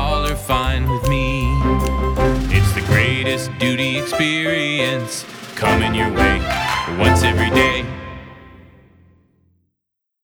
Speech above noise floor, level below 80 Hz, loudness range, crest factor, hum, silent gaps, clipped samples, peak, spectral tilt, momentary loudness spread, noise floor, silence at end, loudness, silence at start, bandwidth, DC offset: 62 dB; -26 dBFS; 2 LU; 18 dB; none; none; under 0.1%; 0 dBFS; -5 dB/octave; 8 LU; -79 dBFS; 1.65 s; -17 LUFS; 0 s; over 20 kHz; under 0.1%